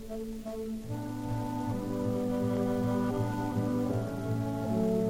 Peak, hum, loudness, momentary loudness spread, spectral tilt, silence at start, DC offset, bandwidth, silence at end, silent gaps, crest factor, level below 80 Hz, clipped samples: -18 dBFS; none; -33 LUFS; 8 LU; -8 dB/octave; 0 s; under 0.1%; 16 kHz; 0 s; none; 12 dB; -50 dBFS; under 0.1%